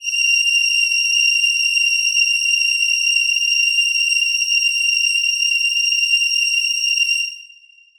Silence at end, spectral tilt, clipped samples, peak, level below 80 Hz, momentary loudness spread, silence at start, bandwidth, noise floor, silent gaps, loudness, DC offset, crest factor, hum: 0.5 s; 8.5 dB/octave; under 0.1%; -4 dBFS; -66 dBFS; 2 LU; 0 s; over 20 kHz; -47 dBFS; none; -14 LUFS; under 0.1%; 12 dB; none